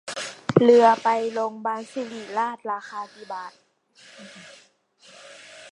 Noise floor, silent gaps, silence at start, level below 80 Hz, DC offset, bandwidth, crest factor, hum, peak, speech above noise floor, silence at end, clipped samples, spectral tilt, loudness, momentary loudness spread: -57 dBFS; none; 0.05 s; -70 dBFS; under 0.1%; 11 kHz; 24 dB; none; 0 dBFS; 34 dB; 0.05 s; under 0.1%; -5.5 dB/octave; -22 LUFS; 27 LU